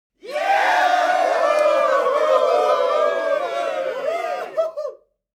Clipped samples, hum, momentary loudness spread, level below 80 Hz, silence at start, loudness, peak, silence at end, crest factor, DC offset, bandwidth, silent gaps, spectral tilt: under 0.1%; none; 8 LU; -74 dBFS; 0.25 s; -19 LUFS; -4 dBFS; 0.4 s; 16 dB; under 0.1%; 15 kHz; none; -1 dB/octave